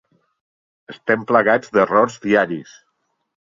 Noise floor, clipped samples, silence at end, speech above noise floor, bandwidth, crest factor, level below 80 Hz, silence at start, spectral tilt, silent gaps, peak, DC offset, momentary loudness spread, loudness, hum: -71 dBFS; under 0.1%; 0.95 s; 53 dB; 7.6 kHz; 18 dB; -62 dBFS; 0.9 s; -6 dB/octave; none; -2 dBFS; under 0.1%; 10 LU; -17 LUFS; none